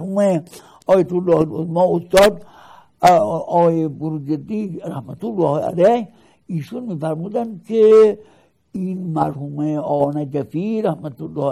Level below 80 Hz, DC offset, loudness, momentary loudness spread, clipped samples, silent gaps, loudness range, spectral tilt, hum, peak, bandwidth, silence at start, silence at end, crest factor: -52 dBFS; under 0.1%; -18 LUFS; 15 LU; under 0.1%; none; 5 LU; -7 dB/octave; none; 0 dBFS; 16 kHz; 0 s; 0 s; 18 dB